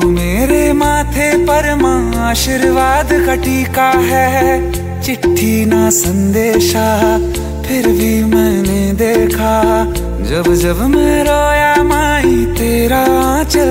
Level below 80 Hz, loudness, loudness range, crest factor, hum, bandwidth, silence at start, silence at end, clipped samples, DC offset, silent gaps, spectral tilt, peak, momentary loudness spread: -22 dBFS; -12 LUFS; 1 LU; 12 dB; none; 16.5 kHz; 0 s; 0 s; under 0.1%; under 0.1%; none; -5 dB/octave; 0 dBFS; 4 LU